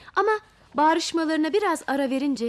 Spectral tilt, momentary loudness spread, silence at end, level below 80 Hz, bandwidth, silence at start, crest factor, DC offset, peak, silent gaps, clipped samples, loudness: -3 dB/octave; 4 LU; 0 s; -64 dBFS; 14 kHz; 0.05 s; 14 dB; under 0.1%; -10 dBFS; none; under 0.1%; -24 LUFS